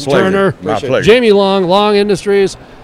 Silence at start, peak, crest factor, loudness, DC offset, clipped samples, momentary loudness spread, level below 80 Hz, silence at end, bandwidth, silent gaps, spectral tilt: 0 s; 0 dBFS; 10 dB; -11 LUFS; under 0.1%; 0.7%; 6 LU; -42 dBFS; 0 s; 12 kHz; none; -5.5 dB/octave